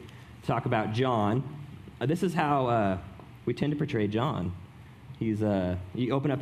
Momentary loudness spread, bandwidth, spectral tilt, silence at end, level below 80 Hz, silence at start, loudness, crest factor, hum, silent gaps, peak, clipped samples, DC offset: 18 LU; 14 kHz; -7.5 dB/octave; 0 s; -56 dBFS; 0 s; -29 LUFS; 20 dB; none; none; -10 dBFS; under 0.1%; under 0.1%